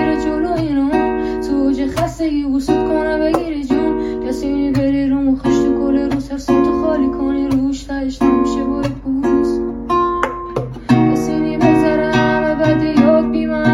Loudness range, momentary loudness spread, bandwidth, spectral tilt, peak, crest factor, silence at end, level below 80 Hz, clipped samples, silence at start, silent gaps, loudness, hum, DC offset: 3 LU; 7 LU; 12.5 kHz; -7 dB/octave; 0 dBFS; 14 dB; 0 s; -34 dBFS; under 0.1%; 0 s; none; -16 LUFS; none; under 0.1%